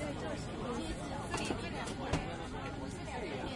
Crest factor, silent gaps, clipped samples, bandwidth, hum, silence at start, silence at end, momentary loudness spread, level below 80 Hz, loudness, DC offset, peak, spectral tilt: 20 dB; none; under 0.1%; 11.5 kHz; none; 0 s; 0 s; 4 LU; -50 dBFS; -40 LUFS; under 0.1%; -18 dBFS; -5 dB/octave